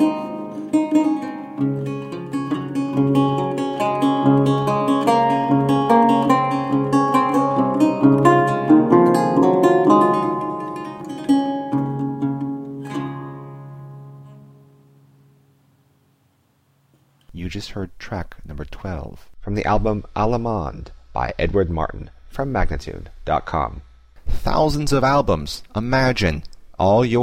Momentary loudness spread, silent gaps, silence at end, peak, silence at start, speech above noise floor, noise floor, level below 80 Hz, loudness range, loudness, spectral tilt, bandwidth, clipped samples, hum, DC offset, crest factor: 17 LU; none; 0 s; 0 dBFS; 0 s; 42 dB; -62 dBFS; -34 dBFS; 17 LU; -19 LUFS; -7 dB/octave; 15 kHz; under 0.1%; none; under 0.1%; 18 dB